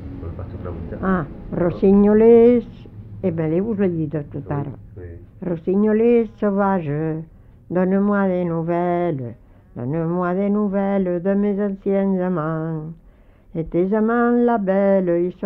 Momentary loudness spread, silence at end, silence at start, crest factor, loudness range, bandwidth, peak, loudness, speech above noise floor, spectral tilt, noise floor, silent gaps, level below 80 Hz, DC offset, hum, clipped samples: 16 LU; 0 s; 0 s; 16 dB; 5 LU; 4 kHz; -4 dBFS; -19 LUFS; 30 dB; -12 dB/octave; -49 dBFS; none; -44 dBFS; under 0.1%; none; under 0.1%